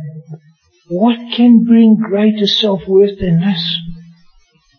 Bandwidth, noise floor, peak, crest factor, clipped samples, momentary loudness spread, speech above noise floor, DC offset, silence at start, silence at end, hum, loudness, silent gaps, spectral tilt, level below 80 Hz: 6.6 kHz; -51 dBFS; 0 dBFS; 12 dB; under 0.1%; 14 LU; 40 dB; under 0.1%; 0 s; 0.75 s; none; -12 LUFS; none; -7.5 dB/octave; -42 dBFS